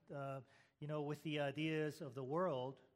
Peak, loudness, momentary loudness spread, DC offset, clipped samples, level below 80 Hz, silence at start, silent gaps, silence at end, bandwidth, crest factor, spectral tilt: -28 dBFS; -44 LUFS; 9 LU; under 0.1%; under 0.1%; -86 dBFS; 0.1 s; none; 0.15 s; 15.5 kHz; 16 dB; -6.5 dB/octave